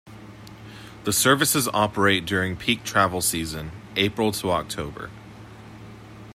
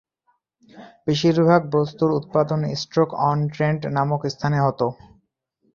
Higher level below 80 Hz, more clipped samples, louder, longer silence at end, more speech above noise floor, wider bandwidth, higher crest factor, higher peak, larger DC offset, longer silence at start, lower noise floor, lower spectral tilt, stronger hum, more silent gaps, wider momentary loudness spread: first, -52 dBFS vs -58 dBFS; neither; about the same, -22 LUFS vs -21 LUFS; second, 0 s vs 0.8 s; second, 20 dB vs 48 dB; first, 16 kHz vs 7.2 kHz; about the same, 22 dB vs 20 dB; about the same, -4 dBFS vs -2 dBFS; neither; second, 0.05 s vs 0.75 s; second, -43 dBFS vs -69 dBFS; second, -3 dB/octave vs -7 dB/octave; neither; neither; first, 24 LU vs 7 LU